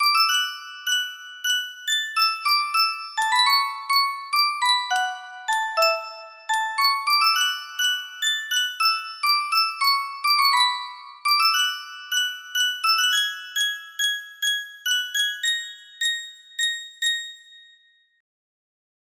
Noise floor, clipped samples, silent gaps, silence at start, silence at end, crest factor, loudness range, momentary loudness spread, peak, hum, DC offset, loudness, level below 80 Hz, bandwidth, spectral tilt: -58 dBFS; under 0.1%; none; 0 s; 1.6 s; 18 dB; 4 LU; 10 LU; -6 dBFS; none; under 0.1%; -21 LUFS; -80 dBFS; 16 kHz; 5 dB/octave